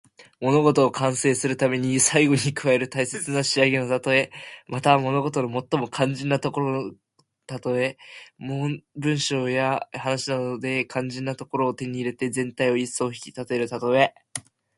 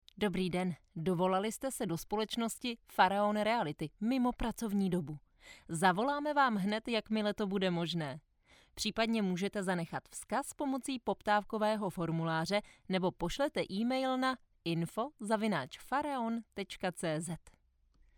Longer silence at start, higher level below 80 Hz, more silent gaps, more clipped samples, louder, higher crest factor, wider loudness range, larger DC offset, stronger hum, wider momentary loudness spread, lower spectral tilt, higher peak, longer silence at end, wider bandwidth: about the same, 0.2 s vs 0.15 s; about the same, -64 dBFS vs -60 dBFS; neither; neither; first, -23 LUFS vs -35 LUFS; about the same, 22 dB vs 22 dB; first, 6 LU vs 3 LU; neither; neither; first, 11 LU vs 8 LU; about the same, -4.5 dB/octave vs -5 dB/octave; first, -2 dBFS vs -14 dBFS; second, 0.4 s vs 0.8 s; second, 11.5 kHz vs over 20 kHz